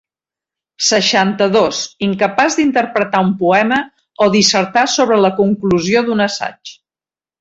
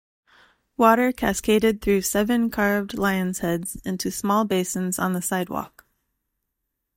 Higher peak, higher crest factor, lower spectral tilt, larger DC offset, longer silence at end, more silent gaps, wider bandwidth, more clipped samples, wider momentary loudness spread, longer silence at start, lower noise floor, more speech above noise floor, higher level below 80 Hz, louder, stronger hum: about the same, 0 dBFS vs -2 dBFS; second, 14 dB vs 22 dB; about the same, -3.5 dB/octave vs -4.5 dB/octave; neither; second, 0.65 s vs 1.3 s; neither; second, 8 kHz vs 16.5 kHz; neither; about the same, 7 LU vs 9 LU; about the same, 0.8 s vs 0.8 s; first, under -90 dBFS vs -80 dBFS; first, over 76 dB vs 58 dB; second, -54 dBFS vs -48 dBFS; first, -14 LUFS vs -23 LUFS; neither